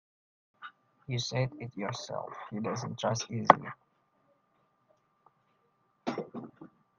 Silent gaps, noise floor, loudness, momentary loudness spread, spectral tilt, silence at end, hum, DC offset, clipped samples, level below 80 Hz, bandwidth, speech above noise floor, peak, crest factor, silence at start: none; -73 dBFS; -32 LUFS; 26 LU; -5 dB/octave; 0.35 s; none; under 0.1%; under 0.1%; -70 dBFS; 7.6 kHz; 42 dB; 0 dBFS; 34 dB; 0.6 s